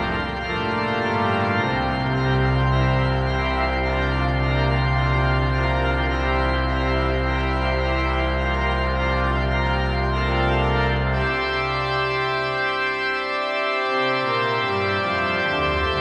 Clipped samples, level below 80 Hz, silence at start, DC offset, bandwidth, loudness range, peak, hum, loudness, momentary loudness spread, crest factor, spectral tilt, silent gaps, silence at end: under 0.1%; -28 dBFS; 0 s; under 0.1%; 8.4 kHz; 1 LU; -8 dBFS; none; -21 LUFS; 2 LU; 12 dB; -7 dB/octave; none; 0 s